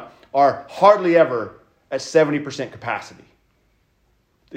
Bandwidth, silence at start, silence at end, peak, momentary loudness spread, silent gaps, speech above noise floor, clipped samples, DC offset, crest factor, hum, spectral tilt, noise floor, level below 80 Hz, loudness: 9.8 kHz; 0 s; 0 s; 0 dBFS; 14 LU; none; 45 dB; under 0.1%; under 0.1%; 20 dB; none; -5.5 dB/octave; -63 dBFS; -64 dBFS; -19 LUFS